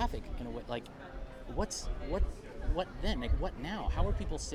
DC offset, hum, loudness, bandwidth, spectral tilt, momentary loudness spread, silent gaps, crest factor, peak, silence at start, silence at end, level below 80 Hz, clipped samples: under 0.1%; none; -38 LUFS; 12 kHz; -5 dB/octave; 9 LU; none; 18 dB; -18 dBFS; 0 s; 0 s; -36 dBFS; under 0.1%